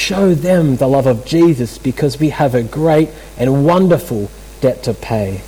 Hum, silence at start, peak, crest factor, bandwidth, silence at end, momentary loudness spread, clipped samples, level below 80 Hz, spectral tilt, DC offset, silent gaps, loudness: none; 0 s; -2 dBFS; 12 dB; 19 kHz; 0 s; 8 LU; under 0.1%; -36 dBFS; -7 dB/octave; under 0.1%; none; -14 LUFS